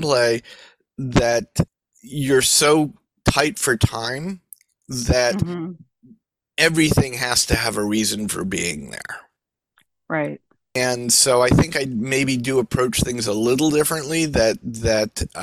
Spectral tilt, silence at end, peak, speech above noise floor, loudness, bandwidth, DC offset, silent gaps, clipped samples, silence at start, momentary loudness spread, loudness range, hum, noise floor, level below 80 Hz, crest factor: -3.5 dB/octave; 0 s; -2 dBFS; 58 dB; -19 LUFS; 16 kHz; under 0.1%; none; under 0.1%; 0 s; 15 LU; 4 LU; none; -78 dBFS; -38 dBFS; 18 dB